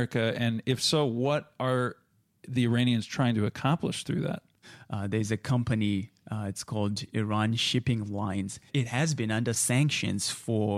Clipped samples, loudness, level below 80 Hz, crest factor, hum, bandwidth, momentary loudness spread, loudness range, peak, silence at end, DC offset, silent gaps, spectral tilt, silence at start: under 0.1%; -29 LUFS; -60 dBFS; 16 dB; none; 15 kHz; 9 LU; 3 LU; -12 dBFS; 0 s; under 0.1%; none; -5 dB/octave; 0 s